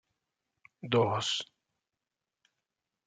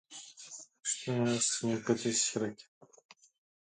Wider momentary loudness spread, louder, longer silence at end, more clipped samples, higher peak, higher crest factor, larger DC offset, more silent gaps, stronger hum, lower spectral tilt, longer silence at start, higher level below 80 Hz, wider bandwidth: about the same, 19 LU vs 18 LU; about the same, -30 LUFS vs -32 LUFS; first, 1.65 s vs 1.15 s; neither; about the same, -14 dBFS vs -16 dBFS; about the same, 22 dB vs 20 dB; neither; neither; neither; about the same, -4.5 dB/octave vs -3.5 dB/octave; first, 0.85 s vs 0.1 s; about the same, -78 dBFS vs -76 dBFS; about the same, 9.4 kHz vs 9.6 kHz